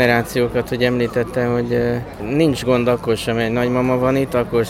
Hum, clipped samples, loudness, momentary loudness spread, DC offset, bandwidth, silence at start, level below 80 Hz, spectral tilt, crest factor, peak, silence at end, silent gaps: none; under 0.1%; -18 LUFS; 3 LU; under 0.1%; 16.5 kHz; 0 s; -40 dBFS; -6.5 dB/octave; 16 dB; -2 dBFS; 0 s; none